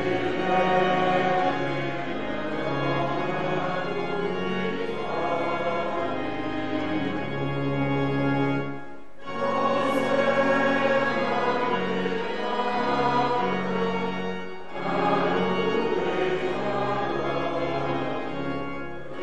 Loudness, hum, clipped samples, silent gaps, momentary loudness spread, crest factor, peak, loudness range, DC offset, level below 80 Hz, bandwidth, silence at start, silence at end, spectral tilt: -26 LUFS; none; under 0.1%; none; 8 LU; 16 dB; -10 dBFS; 4 LU; 2%; -56 dBFS; 11 kHz; 0 s; 0 s; -6.5 dB/octave